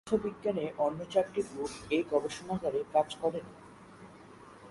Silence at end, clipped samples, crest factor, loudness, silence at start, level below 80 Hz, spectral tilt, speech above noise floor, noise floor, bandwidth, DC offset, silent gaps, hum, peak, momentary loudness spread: 0 s; under 0.1%; 18 dB; -33 LUFS; 0.05 s; -64 dBFS; -5.5 dB/octave; 21 dB; -53 dBFS; 11.5 kHz; under 0.1%; none; none; -14 dBFS; 22 LU